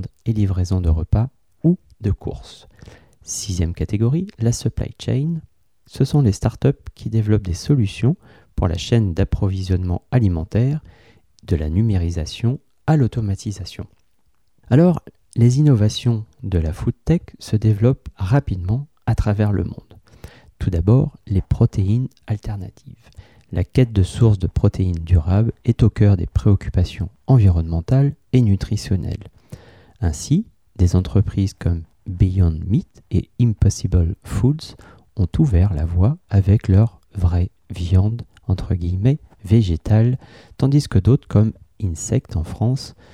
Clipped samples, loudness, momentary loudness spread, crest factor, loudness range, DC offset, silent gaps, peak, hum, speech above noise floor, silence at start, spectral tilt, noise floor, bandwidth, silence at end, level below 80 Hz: under 0.1%; -19 LUFS; 10 LU; 16 dB; 4 LU; 0.1%; none; -4 dBFS; none; 49 dB; 0 s; -7.5 dB/octave; -67 dBFS; 11 kHz; 0.25 s; -32 dBFS